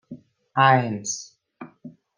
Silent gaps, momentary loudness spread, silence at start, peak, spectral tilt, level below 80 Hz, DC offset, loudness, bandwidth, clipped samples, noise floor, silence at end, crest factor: none; 23 LU; 0.1 s; -4 dBFS; -4 dB/octave; -72 dBFS; under 0.1%; -21 LUFS; 10 kHz; under 0.1%; -46 dBFS; 0.3 s; 22 dB